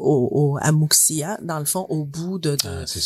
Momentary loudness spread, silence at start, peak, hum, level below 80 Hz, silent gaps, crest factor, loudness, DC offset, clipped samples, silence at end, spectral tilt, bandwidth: 11 LU; 0 s; -2 dBFS; none; -50 dBFS; none; 18 dB; -20 LUFS; under 0.1%; under 0.1%; 0 s; -4 dB/octave; 16 kHz